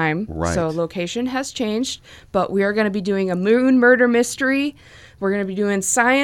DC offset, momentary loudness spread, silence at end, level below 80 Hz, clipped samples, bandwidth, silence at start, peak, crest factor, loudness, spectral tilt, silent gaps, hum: under 0.1%; 10 LU; 0 s; -46 dBFS; under 0.1%; 18 kHz; 0 s; -2 dBFS; 16 dB; -19 LUFS; -4.5 dB/octave; none; none